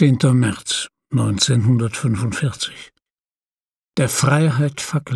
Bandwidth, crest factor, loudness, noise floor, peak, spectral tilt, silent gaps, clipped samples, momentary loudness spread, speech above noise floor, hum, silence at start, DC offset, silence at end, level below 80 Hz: 13 kHz; 16 dB; -19 LUFS; under -90 dBFS; -2 dBFS; -5 dB/octave; 3.12-3.17 s, 3.60-3.72 s; under 0.1%; 9 LU; over 73 dB; none; 0 s; under 0.1%; 0 s; -52 dBFS